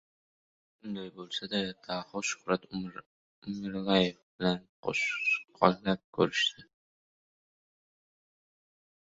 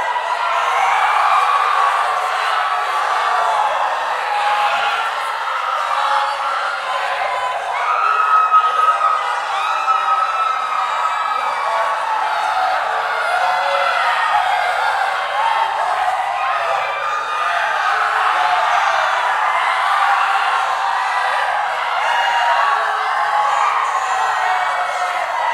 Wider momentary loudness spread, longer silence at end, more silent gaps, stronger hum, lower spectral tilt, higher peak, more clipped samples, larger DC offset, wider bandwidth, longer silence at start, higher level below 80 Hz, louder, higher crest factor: first, 14 LU vs 5 LU; first, 2.4 s vs 0 s; first, 3.06-3.42 s, 4.23-4.39 s, 4.69-4.83 s, 6.04-6.13 s vs none; neither; first, -4.5 dB/octave vs 0.5 dB/octave; second, -6 dBFS vs -2 dBFS; neither; neither; second, 8 kHz vs 16 kHz; first, 0.85 s vs 0 s; about the same, -68 dBFS vs -64 dBFS; second, -31 LUFS vs -17 LUFS; first, 28 dB vs 14 dB